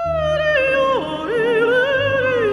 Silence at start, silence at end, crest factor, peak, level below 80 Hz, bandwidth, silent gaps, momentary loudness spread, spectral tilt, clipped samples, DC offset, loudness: 0 s; 0 s; 10 dB; -6 dBFS; -42 dBFS; 11 kHz; none; 4 LU; -5.5 dB/octave; under 0.1%; under 0.1%; -17 LUFS